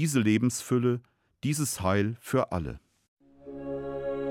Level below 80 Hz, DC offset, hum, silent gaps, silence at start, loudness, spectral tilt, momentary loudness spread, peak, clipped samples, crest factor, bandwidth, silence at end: -56 dBFS; under 0.1%; none; 3.08-3.17 s; 0 s; -29 LUFS; -5.5 dB/octave; 14 LU; -12 dBFS; under 0.1%; 16 dB; 17.5 kHz; 0 s